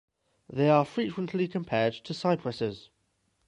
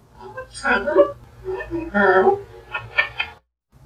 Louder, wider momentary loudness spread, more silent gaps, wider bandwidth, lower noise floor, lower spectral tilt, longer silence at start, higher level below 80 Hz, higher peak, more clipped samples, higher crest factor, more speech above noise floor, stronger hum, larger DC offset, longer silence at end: second, -29 LUFS vs -20 LUFS; second, 11 LU vs 18 LU; neither; about the same, 10.5 kHz vs 9.6 kHz; first, -74 dBFS vs -53 dBFS; first, -7 dB/octave vs -5 dB/octave; first, 0.5 s vs 0.2 s; second, -66 dBFS vs -46 dBFS; second, -10 dBFS vs -2 dBFS; neither; about the same, 20 dB vs 20 dB; first, 46 dB vs 34 dB; neither; neither; first, 0.65 s vs 0.5 s